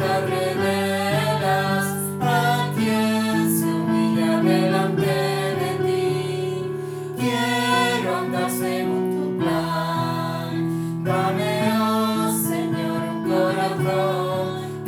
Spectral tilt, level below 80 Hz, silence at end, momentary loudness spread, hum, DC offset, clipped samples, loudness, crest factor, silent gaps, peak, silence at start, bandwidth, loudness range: -5.5 dB/octave; -60 dBFS; 0 s; 6 LU; none; under 0.1%; under 0.1%; -22 LUFS; 14 dB; none; -6 dBFS; 0 s; over 20 kHz; 2 LU